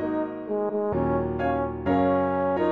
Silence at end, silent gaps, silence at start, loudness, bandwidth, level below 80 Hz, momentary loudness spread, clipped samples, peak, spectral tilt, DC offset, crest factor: 0 s; none; 0 s; -26 LUFS; 4.7 kHz; -46 dBFS; 6 LU; under 0.1%; -12 dBFS; -10 dB/octave; under 0.1%; 14 dB